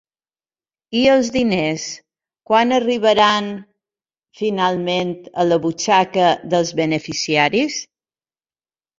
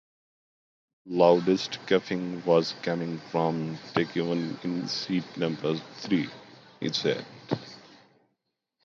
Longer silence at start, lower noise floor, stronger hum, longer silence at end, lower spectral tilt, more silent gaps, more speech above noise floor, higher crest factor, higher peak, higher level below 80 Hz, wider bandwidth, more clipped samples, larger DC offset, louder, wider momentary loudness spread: second, 0.9 s vs 1.05 s; first, under -90 dBFS vs -80 dBFS; neither; about the same, 1.15 s vs 1.05 s; second, -4 dB/octave vs -6 dB/octave; neither; first, over 73 dB vs 53 dB; about the same, 18 dB vs 22 dB; first, -2 dBFS vs -6 dBFS; first, -56 dBFS vs -72 dBFS; about the same, 7.8 kHz vs 7.6 kHz; neither; neither; first, -17 LUFS vs -28 LUFS; about the same, 10 LU vs 11 LU